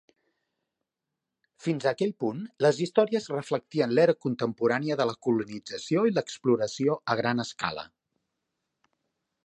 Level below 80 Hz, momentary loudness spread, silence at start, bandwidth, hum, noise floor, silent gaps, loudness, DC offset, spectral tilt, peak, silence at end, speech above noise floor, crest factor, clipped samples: -72 dBFS; 9 LU; 1.6 s; 9.6 kHz; none; -87 dBFS; none; -27 LUFS; under 0.1%; -6 dB/octave; -8 dBFS; 1.6 s; 60 dB; 20 dB; under 0.1%